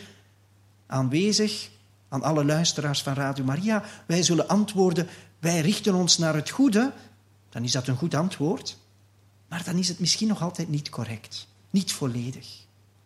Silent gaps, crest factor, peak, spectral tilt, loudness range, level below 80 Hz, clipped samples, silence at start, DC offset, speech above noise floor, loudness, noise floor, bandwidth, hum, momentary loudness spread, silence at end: none; 22 dB; -4 dBFS; -4.5 dB/octave; 5 LU; -68 dBFS; under 0.1%; 0 s; under 0.1%; 33 dB; -25 LUFS; -58 dBFS; 14.5 kHz; none; 13 LU; 0.45 s